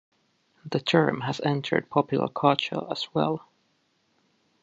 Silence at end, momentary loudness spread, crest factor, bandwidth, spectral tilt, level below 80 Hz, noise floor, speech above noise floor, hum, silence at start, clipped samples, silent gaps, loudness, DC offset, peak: 1.25 s; 7 LU; 22 dB; 8 kHz; -6.5 dB/octave; -70 dBFS; -70 dBFS; 45 dB; none; 0.65 s; under 0.1%; none; -26 LUFS; under 0.1%; -4 dBFS